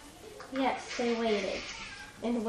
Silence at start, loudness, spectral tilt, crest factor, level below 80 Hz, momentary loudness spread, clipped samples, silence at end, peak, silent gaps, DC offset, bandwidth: 0 s; -33 LUFS; -4 dB/octave; 16 dB; -60 dBFS; 13 LU; under 0.1%; 0 s; -18 dBFS; none; under 0.1%; 13 kHz